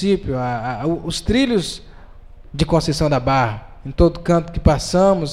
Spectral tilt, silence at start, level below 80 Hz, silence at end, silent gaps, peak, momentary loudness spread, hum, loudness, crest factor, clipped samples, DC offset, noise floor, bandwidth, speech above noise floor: -6 dB/octave; 0 s; -30 dBFS; 0 s; none; 0 dBFS; 10 LU; none; -18 LUFS; 18 dB; under 0.1%; under 0.1%; -39 dBFS; 13 kHz; 22 dB